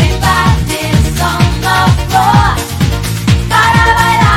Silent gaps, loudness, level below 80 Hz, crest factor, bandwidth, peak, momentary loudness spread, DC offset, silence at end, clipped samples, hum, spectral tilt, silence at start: none; -10 LUFS; -18 dBFS; 10 dB; 17 kHz; 0 dBFS; 6 LU; under 0.1%; 0 s; 0.5%; none; -5 dB/octave; 0 s